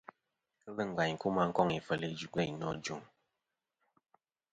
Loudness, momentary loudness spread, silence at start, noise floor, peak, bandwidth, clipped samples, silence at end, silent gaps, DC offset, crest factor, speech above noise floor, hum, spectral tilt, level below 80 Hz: -35 LUFS; 11 LU; 0.65 s; -88 dBFS; -14 dBFS; 9.2 kHz; under 0.1%; 1.5 s; none; under 0.1%; 24 dB; 53 dB; none; -5.5 dB/octave; -68 dBFS